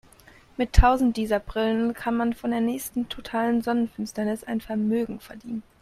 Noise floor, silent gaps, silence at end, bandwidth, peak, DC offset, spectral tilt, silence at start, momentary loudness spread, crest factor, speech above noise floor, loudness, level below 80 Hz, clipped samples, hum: -53 dBFS; none; 0.2 s; 14.5 kHz; -2 dBFS; under 0.1%; -6 dB/octave; 0.6 s; 12 LU; 24 dB; 29 dB; -25 LUFS; -32 dBFS; under 0.1%; none